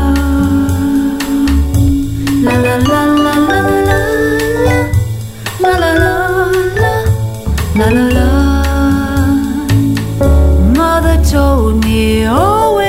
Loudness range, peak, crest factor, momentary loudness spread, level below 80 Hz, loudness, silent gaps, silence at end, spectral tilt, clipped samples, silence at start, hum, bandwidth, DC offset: 1 LU; 0 dBFS; 10 dB; 4 LU; -16 dBFS; -11 LUFS; none; 0 s; -6.5 dB/octave; under 0.1%; 0 s; none; 16.5 kHz; under 0.1%